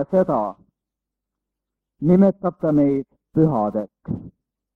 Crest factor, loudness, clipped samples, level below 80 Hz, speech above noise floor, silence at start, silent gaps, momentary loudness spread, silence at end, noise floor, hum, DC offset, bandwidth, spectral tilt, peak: 18 dB; -20 LUFS; under 0.1%; -54 dBFS; 66 dB; 0 s; none; 15 LU; 0.45 s; -85 dBFS; none; under 0.1%; 3.9 kHz; -11.5 dB/octave; -4 dBFS